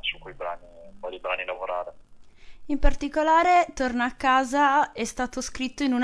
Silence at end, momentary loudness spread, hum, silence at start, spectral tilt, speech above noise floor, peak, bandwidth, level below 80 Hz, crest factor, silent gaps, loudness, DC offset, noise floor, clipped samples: 0 s; 15 LU; none; 0 s; -3.5 dB/octave; 24 dB; -6 dBFS; 11 kHz; -34 dBFS; 18 dB; none; -25 LUFS; under 0.1%; -47 dBFS; under 0.1%